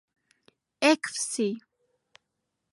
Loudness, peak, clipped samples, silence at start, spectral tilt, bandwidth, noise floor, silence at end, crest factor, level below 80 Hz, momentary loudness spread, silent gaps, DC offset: -26 LUFS; -8 dBFS; under 0.1%; 0.8 s; -2.5 dB/octave; 11.5 kHz; -82 dBFS; 1.15 s; 24 dB; -84 dBFS; 8 LU; none; under 0.1%